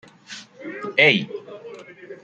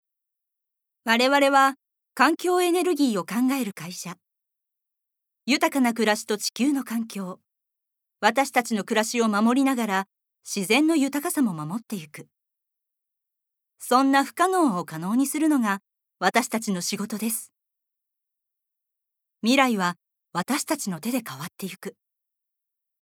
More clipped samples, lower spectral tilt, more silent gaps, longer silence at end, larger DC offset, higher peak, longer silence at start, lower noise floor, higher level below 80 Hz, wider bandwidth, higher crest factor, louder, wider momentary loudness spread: neither; about the same, -4.5 dB/octave vs -3.5 dB/octave; neither; second, 0.1 s vs 1.1 s; neither; about the same, -2 dBFS vs -2 dBFS; second, 0.3 s vs 1.05 s; second, -42 dBFS vs -84 dBFS; first, -70 dBFS vs -86 dBFS; second, 9 kHz vs 18.5 kHz; about the same, 24 dB vs 22 dB; first, -17 LUFS vs -23 LUFS; first, 25 LU vs 15 LU